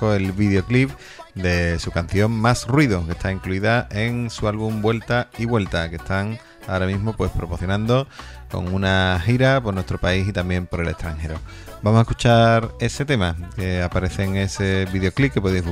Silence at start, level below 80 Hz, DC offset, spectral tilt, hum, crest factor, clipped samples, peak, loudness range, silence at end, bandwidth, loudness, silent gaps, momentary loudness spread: 0 s; -36 dBFS; under 0.1%; -6.5 dB/octave; none; 20 dB; under 0.1%; -2 dBFS; 3 LU; 0 s; 15 kHz; -21 LUFS; none; 9 LU